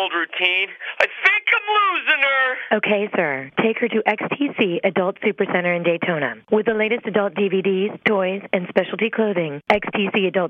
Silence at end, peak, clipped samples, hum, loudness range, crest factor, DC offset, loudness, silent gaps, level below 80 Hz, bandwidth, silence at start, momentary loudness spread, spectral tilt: 0 s; 0 dBFS; under 0.1%; none; 3 LU; 20 dB; under 0.1%; -19 LUFS; none; -62 dBFS; 7.6 kHz; 0 s; 6 LU; -6.5 dB/octave